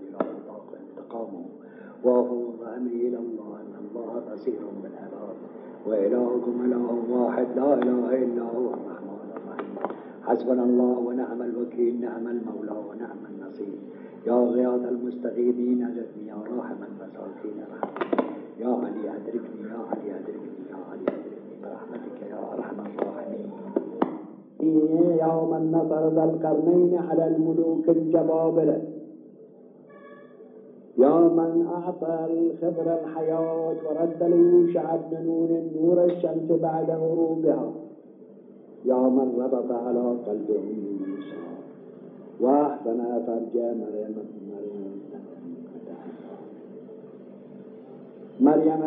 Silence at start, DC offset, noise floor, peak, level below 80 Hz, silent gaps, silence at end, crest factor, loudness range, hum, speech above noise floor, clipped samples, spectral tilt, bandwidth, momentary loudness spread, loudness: 0 s; under 0.1%; -49 dBFS; -6 dBFS; -84 dBFS; none; 0 s; 20 dB; 11 LU; none; 25 dB; under 0.1%; -9 dB/octave; 3.9 kHz; 19 LU; -25 LUFS